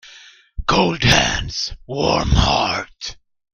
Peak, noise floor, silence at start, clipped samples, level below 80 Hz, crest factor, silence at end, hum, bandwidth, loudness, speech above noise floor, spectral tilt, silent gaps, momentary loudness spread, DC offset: 0 dBFS; -45 dBFS; 0.05 s; under 0.1%; -28 dBFS; 20 dB; 0.4 s; none; 15.5 kHz; -18 LUFS; 27 dB; -4 dB/octave; none; 16 LU; under 0.1%